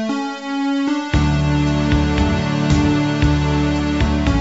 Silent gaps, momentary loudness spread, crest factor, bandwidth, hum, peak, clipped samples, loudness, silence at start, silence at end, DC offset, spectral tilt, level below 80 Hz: none; 4 LU; 14 dB; 8 kHz; none; -4 dBFS; under 0.1%; -18 LUFS; 0 s; 0 s; 0.2%; -6.5 dB/octave; -24 dBFS